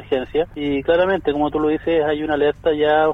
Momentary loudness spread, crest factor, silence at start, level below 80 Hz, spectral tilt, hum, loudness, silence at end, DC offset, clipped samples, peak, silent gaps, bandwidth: 5 LU; 14 dB; 0 s; -42 dBFS; -7.5 dB/octave; none; -19 LUFS; 0 s; under 0.1%; under 0.1%; -4 dBFS; none; 4.1 kHz